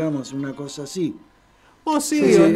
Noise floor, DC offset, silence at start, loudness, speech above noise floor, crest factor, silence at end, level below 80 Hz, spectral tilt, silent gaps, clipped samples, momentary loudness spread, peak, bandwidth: -55 dBFS; under 0.1%; 0 s; -22 LUFS; 35 dB; 16 dB; 0 s; -56 dBFS; -5.5 dB/octave; none; under 0.1%; 15 LU; -4 dBFS; 15 kHz